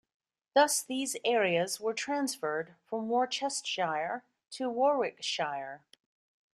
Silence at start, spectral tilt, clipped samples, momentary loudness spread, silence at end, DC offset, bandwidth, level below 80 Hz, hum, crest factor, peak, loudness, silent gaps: 0.55 s; -2.5 dB/octave; under 0.1%; 11 LU; 0.75 s; under 0.1%; 14.5 kHz; -82 dBFS; none; 20 dB; -12 dBFS; -31 LUFS; none